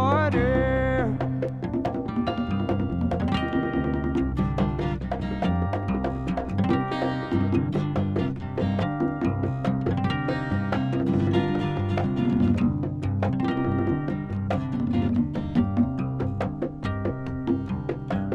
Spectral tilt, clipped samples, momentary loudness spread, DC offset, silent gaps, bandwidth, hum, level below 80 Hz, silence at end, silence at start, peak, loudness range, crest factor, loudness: -9 dB/octave; under 0.1%; 6 LU; under 0.1%; none; 8 kHz; none; -40 dBFS; 0 s; 0 s; -10 dBFS; 2 LU; 16 dB; -26 LUFS